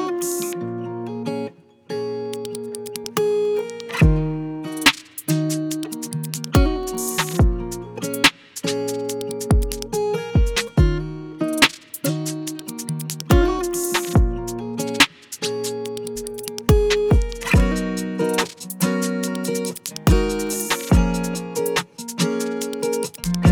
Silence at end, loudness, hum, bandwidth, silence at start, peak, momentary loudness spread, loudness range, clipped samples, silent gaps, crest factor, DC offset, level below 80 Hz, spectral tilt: 0 s; -22 LUFS; none; over 20 kHz; 0 s; 0 dBFS; 11 LU; 2 LU; under 0.1%; none; 22 dB; under 0.1%; -28 dBFS; -4.5 dB/octave